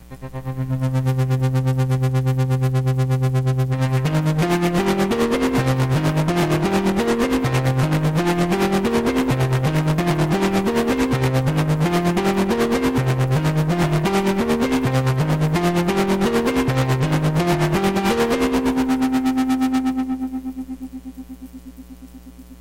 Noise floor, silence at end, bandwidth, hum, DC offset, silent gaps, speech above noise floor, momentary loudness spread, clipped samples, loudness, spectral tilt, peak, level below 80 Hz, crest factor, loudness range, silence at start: -40 dBFS; 0.05 s; 16.5 kHz; none; under 0.1%; none; 18 dB; 5 LU; under 0.1%; -19 LUFS; -6.5 dB/octave; -10 dBFS; -40 dBFS; 8 dB; 2 LU; 0 s